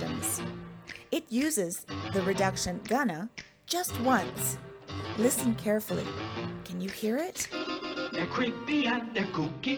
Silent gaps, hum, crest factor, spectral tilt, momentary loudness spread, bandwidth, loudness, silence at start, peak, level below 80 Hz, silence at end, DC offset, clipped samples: none; none; 18 dB; -4 dB/octave; 11 LU; over 20 kHz; -31 LUFS; 0 s; -12 dBFS; -60 dBFS; 0 s; under 0.1%; under 0.1%